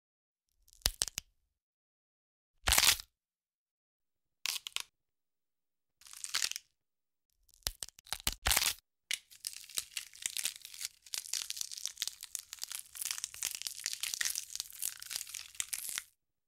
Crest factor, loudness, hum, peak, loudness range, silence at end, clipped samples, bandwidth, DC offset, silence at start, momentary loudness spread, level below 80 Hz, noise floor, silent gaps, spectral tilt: 32 dB; -36 LUFS; none; -8 dBFS; 8 LU; 0.45 s; under 0.1%; 16.5 kHz; under 0.1%; 0.85 s; 14 LU; -54 dBFS; under -90 dBFS; 1.62-2.54 s, 3.55-4.00 s, 7.25-7.30 s, 8.00-8.05 s, 8.38-8.42 s; 1 dB/octave